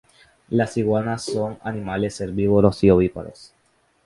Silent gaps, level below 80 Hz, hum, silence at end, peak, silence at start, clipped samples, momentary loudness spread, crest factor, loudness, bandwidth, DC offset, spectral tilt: none; -44 dBFS; none; 0.6 s; 0 dBFS; 0.5 s; under 0.1%; 11 LU; 20 dB; -21 LUFS; 11.5 kHz; under 0.1%; -7 dB/octave